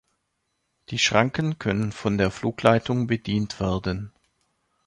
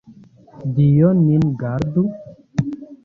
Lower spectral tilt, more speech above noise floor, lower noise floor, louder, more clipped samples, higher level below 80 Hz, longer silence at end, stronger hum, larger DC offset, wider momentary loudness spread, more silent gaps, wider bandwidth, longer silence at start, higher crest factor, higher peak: second, -5 dB/octave vs -10 dB/octave; first, 52 dB vs 30 dB; first, -75 dBFS vs -45 dBFS; second, -24 LUFS vs -18 LUFS; neither; about the same, -48 dBFS vs -46 dBFS; first, 0.75 s vs 0.1 s; neither; neither; second, 9 LU vs 14 LU; neither; first, 11.5 kHz vs 6.8 kHz; first, 0.9 s vs 0.1 s; first, 24 dB vs 14 dB; about the same, -2 dBFS vs -4 dBFS